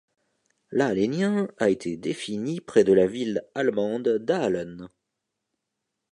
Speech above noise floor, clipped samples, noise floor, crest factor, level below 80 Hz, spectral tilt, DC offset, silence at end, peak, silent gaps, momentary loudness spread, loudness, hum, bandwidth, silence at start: 58 dB; under 0.1%; -82 dBFS; 20 dB; -64 dBFS; -6 dB/octave; under 0.1%; 1.25 s; -6 dBFS; none; 10 LU; -25 LUFS; none; 11 kHz; 0.7 s